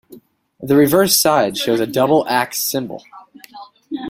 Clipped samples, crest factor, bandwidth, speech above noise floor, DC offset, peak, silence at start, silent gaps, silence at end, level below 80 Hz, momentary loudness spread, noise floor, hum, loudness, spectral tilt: under 0.1%; 16 dB; 16.5 kHz; 29 dB; under 0.1%; 0 dBFS; 0.1 s; none; 0 s; -56 dBFS; 18 LU; -45 dBFS; none; -15 LUFS; -3.5 dB/octave